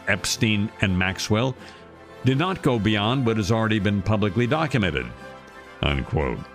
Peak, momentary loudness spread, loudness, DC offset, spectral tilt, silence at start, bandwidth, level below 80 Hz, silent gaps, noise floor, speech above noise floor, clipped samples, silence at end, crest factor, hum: -6 dBFS; 14 LU; -23 LUFS; under 0.1%; -5.5 dB/octave; 0 s; 15.5 kHz; -40 dBFS; none; -43 dBFS; 20 dB; under 0.1%; 0 s; 18 dB; none